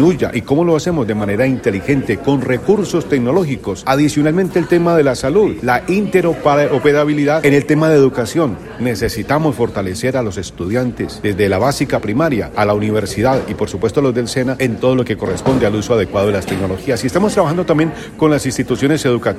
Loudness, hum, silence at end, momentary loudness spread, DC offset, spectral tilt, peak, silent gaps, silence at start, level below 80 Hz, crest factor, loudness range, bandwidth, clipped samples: -15 LUFS; none; 0 s; 6 LU; under 0.1%; -6 dB/octave; 0 dBFS; none; 0 s; -40 dBFS; 14 dB; 4 LU; 15 kHz; under 0.1%